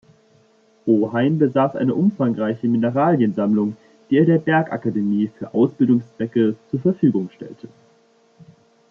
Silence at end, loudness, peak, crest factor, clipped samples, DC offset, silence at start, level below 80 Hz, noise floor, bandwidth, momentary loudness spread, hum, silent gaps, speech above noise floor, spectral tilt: 0.45 s; -19 LUFS; -4 dBFS; 16 dB; under 0.1%; under 0.1%; 0.85 s; -66 dBFS; -57 dBFS; 6.2 kHz; 7 LU; none; none; 38 dB; -10 dB/octave